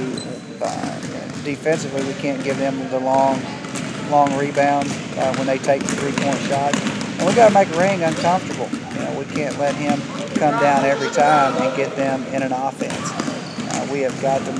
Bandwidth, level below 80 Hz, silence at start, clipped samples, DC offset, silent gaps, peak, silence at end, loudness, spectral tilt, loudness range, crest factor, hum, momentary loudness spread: 11 kHz; -58 dBFS; 0 s; under 0.1%; under 0.1%; none; 0 dBFS; 0 s; -20 LUFS; -5 dB/octave; 4 LU; 18 dB; none; 11 LU